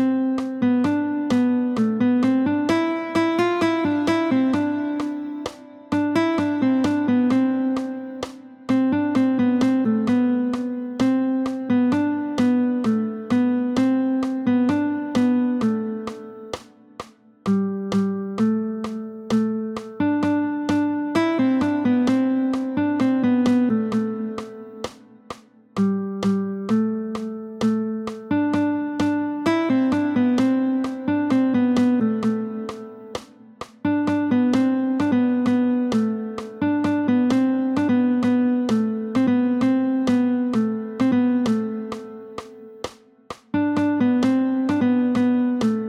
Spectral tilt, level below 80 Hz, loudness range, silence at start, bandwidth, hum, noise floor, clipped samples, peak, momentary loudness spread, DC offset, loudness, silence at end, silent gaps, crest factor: -7 dB/octave; -60 dBFS; 4 LU; 0 s; 10 kHz; none; -41 dBFS; under 0.1%; -8 dBFS; 13 LU; under 0.1%; -21 LUFS; 0 s; none; 12 dB